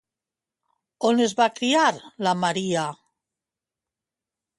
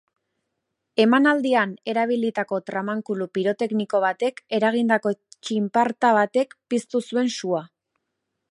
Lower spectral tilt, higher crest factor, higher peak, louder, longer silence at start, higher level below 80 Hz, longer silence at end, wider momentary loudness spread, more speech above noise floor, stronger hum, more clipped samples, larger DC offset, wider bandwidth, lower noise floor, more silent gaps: about the same, -4 dB/octave vs -5 dB/octave; about the same, 18 dB vs 18 dB; second, -8 dBFS vs -4 dBFS; about the same, -23 LUFS vs -23 LUFS; about the same, 1 s vs 0.95 s; about the same, -72 dBFS vs -76 dBFS; first, 1.65 s vs 0.85 s; about the same, 7 LU vs 9 LU; first, 67 dB vs 57 dB; neither; neither; neither; about the same, 11.5 kHz vs 11.5 kHz; first, -89 dBFS vs -79 dBFS; neither